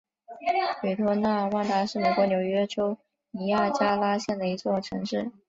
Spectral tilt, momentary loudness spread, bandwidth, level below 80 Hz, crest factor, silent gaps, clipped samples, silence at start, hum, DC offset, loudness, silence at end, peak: -6 dB/octave; 7 LU; 7.8 kHz; -64 dBFS; 16 dB; none; under 0.1%; 0.3 s; none; under 0.1%; -26 LUFS; 0.2 s; -10 dBFS